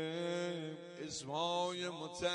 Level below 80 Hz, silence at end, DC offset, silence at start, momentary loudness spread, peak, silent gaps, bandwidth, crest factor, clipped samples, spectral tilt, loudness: -76 dBFS; 0 s; under 0.1%; 0 s; 8 LU; -24 dBFS; none; 11 kHz; 16 dB; under 0.1%; -4 dB/octave; -40 LUFS